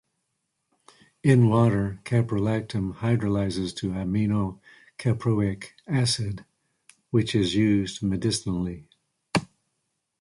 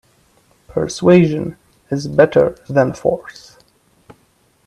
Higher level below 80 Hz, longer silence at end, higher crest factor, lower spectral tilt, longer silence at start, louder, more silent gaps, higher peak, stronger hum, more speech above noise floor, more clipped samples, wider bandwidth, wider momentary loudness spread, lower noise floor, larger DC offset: about the same, -50 dBFS vs -50 dBFS; second, 0.75 s vs 1.35 s; about the same, 20 dB vs 18 dB; about the same, -6 dB/octave vs -7 dB/octave; first, 1.25 s vs 0.75 s; second, -25 LUFS vs -16 LUFS; neither; second, -6 dBFS vs 0 dBFS; neither; first, 54 dB vs 43 dB; neither; about the same, 11.5 kHz vs 11 kHz; second, 9 LU vs 14 LU; first, -78 dBFS vs -57 dBFS; neither